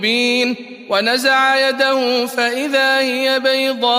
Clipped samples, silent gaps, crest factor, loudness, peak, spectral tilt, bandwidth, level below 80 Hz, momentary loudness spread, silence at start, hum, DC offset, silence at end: under 0.1%; none; 14 dB; -15 LUFS; -2 dBFS; -2 dB/octave; 15.5 kHz; -70 dBFS; 5 LU; 0 s; none; under 0.1%; 0 s